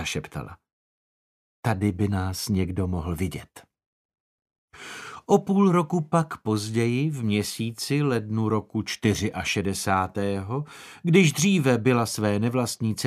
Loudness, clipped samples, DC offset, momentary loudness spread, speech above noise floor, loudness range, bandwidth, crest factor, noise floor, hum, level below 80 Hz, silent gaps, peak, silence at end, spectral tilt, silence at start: -25 LUFS; under 0.1%; under 0.1%; 12 LU; over 66 dB; 6 LU; 15 kHz; 20 dB; under -90 dBFS; none; -52 dBFS; 0.72-1.63 s, 3.86-4.09 s, 4.20-4.38 s, 4.58-4.68 s; -4 dBFS; 0 s; -5.5 dB/octave; 0 s